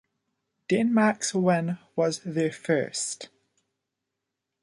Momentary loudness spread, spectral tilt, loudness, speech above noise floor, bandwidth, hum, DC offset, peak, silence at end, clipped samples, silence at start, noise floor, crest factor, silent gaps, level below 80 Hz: 10 LU; -5 dB/octave; -26 LUFS; 59 dB; 11.5 kHz; none; under 0.1%; -8 dBFS; 1.35 s; under 0.1%; 0.7 s; -84 dBFS; 20 dB; none; -72 dBFS